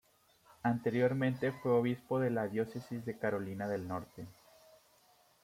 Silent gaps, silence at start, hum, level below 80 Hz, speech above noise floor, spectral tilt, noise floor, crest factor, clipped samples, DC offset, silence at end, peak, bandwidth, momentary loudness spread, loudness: none; 0.65 s; none; -74 dBFS; 33 dB; -8 dB/octave; -68 dBFS; 18 dB; under 0.1%; under 0.1%; 1.1 s; -18 dBFS; 16.5 kHz; 11 LU; -35 LUFS